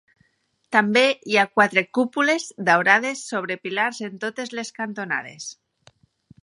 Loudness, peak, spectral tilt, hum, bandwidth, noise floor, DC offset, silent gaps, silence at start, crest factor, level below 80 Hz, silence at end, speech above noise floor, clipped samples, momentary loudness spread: -21 LUFS; -2 dBFS; -3.5 dB/octave; none; 11.5 kHz; -68 dBFS; under 0.1%; none; 0.7 s; 22 dB; -72 dBFS; 0.9 s; 46 dB; under 0.1%; 13 LU